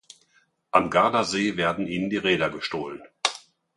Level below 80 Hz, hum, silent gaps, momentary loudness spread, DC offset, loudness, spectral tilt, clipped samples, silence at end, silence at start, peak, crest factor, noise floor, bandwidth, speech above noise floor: -58 dBFS; none; none; 10 LU; under 0.1%; -24 LUFS; -4 dB/octave; under 0.1%; 0.4 s; 0.75 s; -2 dBFS; 24 dB; -65 dBFS; 11.5 kHz; 41 dB